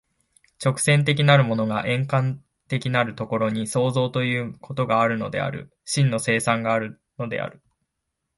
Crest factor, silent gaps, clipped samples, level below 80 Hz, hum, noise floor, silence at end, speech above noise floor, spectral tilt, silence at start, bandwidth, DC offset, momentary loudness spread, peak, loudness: 18 dB; none; under 0.1%; -60 dBFS; none; -80 dBFS; 0.85 s; 57 dB; -5.5 dB/octave; 0.6 s; 11.5 kHz; under 0.1%; 12 LU; -4 dBFS; -22 LUFS